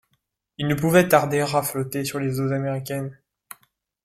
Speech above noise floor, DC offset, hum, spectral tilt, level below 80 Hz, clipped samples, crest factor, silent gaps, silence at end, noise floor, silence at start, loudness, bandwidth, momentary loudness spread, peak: 51 dB; under 0.1%; none; -5.5 dB/octave; -58 dBFS; under 0.1%; 22 dB; none; 0.9 s; -73 dBFS; 0.6 s; -22 LUFS; 16.5 kHz; 13 LU; -2 dBFS